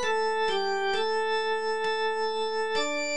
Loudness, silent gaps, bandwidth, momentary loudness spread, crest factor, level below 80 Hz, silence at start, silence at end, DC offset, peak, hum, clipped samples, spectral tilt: -27 LUFS; none; 10 kHz; 2 LU; 10 dB; -64 dBFS; 0 s; 0 s; 1%; -16 dBFS; none; under 0.1%; -1.5 dB/octave